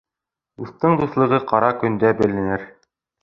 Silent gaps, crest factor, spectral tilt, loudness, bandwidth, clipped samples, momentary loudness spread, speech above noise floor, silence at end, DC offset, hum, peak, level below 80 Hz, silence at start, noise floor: none; 18 dB; -9 dB/octave; -19 LUFS; 7 kHz; under 0.1%; 10 LU; 68 dB; 0.5 s; under 0.1%; none; -2 dBFS; -52 dBFS; 0.6 s; -86 dBFS